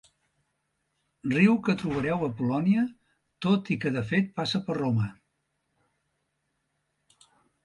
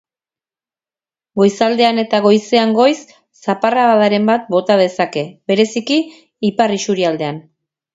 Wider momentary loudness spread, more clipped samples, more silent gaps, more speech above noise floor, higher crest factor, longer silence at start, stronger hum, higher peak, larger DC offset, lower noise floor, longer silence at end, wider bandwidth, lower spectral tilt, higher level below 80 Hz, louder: second, 8 LU vs 11 LU; neither; neither; second, 52 dB vs over 76 dB; about the same, 20 dB vs 16 dB; about the same, 1.25 s vs 1.35 s; neither; second, -8 dBFS vs 0 dBFS; neither; second, -78 dBFS vs under -90 dBFS; first, 2.5 s vs 0.55 s; first, 11 kHz vs 8 kHz; first, -7 dB/octave vs -5 dB/octave; about the same, -62 dBFS vs -64 dBFS; second, -27 LUFS vs -15 LUFS